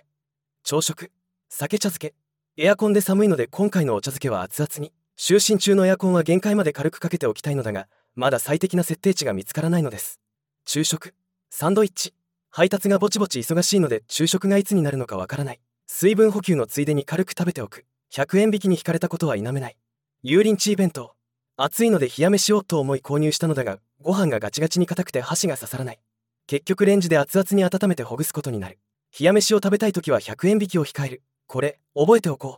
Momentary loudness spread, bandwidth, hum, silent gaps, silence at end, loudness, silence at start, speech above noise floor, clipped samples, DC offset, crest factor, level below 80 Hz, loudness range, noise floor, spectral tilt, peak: 13 LU; 18 kHz; none; none; 0 s; -21 LUFS; 0.65 s; 62 dB; under 0.1%; under 0.1%; 20 dB; -70 dBFS; 4 LU; -83 dBFS; -5 dB/octave; -2 dBFS